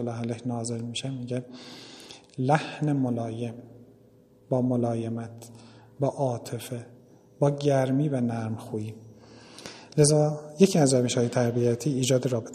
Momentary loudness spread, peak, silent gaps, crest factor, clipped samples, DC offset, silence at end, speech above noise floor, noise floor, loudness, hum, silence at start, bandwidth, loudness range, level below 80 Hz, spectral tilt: 21 LU; -4 dBFS; none; 22 dB; under 0.1%; under 0.1%; 0 s; 31 dB; -57 dBFS; -26 LUFS; none; 0 s; 13.5 kHz; 7 LU; -64 dBFS; -6 dB/octave